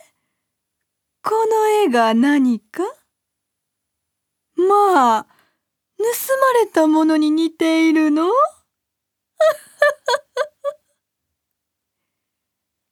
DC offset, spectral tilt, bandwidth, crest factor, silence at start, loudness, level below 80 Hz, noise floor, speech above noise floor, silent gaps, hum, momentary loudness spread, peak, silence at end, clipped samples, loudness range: under 0.1%; -3.5 dB/octave; 19 kHz; 18 dB; 1.25 s; -17 LUFS; -78 dBFS; -80 dBFS; 64 dB; none; none; 11 LU; -2 dBFS; 2.2 s; under 0.1%; 6 LU